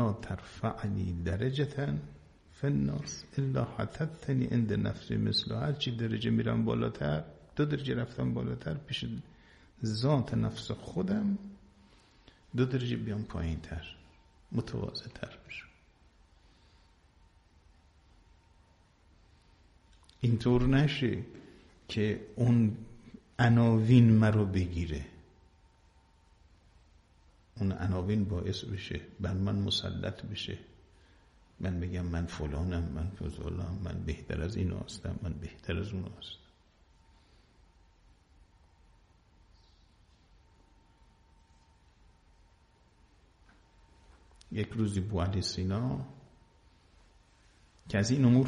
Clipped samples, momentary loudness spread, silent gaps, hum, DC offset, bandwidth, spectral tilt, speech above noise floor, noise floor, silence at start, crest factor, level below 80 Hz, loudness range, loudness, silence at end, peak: under 0.1%; 14 LU; none; none; under 0.1%; 10.5 kHz; -7 dB/octave; 34 dB; -64 dBFS; 0 s; 24 dB; -50 dBFS; 14 LU; -32 LUFS; 0 s; -10 dBFS